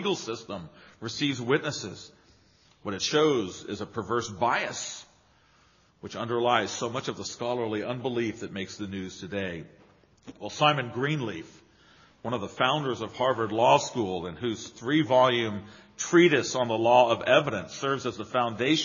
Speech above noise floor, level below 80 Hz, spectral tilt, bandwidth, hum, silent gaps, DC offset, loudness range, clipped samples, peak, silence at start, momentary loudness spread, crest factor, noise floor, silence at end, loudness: 35 dB; -66 dBFS; -3.5 dB/octave; 7.4 kHz; none; none; under 0.1%; 7 LU; under 0.1%; -6 dBFS; 0 s; 15 LU; 22 dB; -62 dBFS; 0 s; -27 LUFS